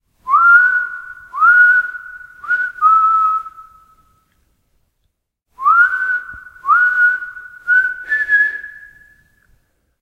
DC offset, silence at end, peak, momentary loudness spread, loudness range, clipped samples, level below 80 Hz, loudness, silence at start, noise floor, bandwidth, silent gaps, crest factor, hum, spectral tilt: under 0.1%; 1.25 s; 0 dBFS; 21 LU; 5 LU; under 0.1%; -56 dBFS; -13 LUFS; 0.25 s; -69 dBFS; 7.6 kHz; none; 16 dB; none; -1.5 dB/octave